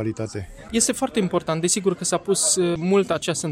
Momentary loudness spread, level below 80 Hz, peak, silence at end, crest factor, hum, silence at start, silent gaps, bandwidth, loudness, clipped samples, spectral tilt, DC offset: 9 LU; -52 dBFS; -6 dBFS; 0 s; 16 dB; none; 0 s; none; 16 kHz; -21 LUFS; under 0.1%; -3.5 dB/octave; under 0.1%